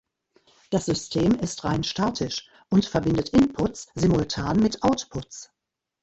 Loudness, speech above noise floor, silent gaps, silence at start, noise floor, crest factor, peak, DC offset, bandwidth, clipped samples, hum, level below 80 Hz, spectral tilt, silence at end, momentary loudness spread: -24 LUFS; 61 dB; none; 0.7 s; -85 dBFS; 18 dB; -6 dBFS; under 0.1%; 8.4 kHz; under 0.1%; none; -46 dBFS; -5.5 dB/octave; 0.6 s; 9 LU